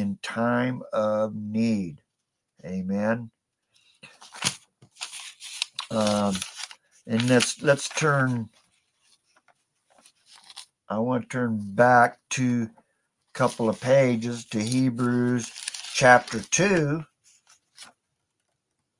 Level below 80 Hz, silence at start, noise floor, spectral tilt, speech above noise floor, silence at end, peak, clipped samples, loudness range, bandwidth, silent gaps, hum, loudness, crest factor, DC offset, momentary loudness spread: -66 dBFS; 0 s; -81 dBFS; -4.5 dB/octave; 57 dB; 1.15 s; -2 dBFS; under 0.1%; 9 LU; 11.5 kHz; none; none; -24 LUFS; 24 dB; under 0.1%; 18 LU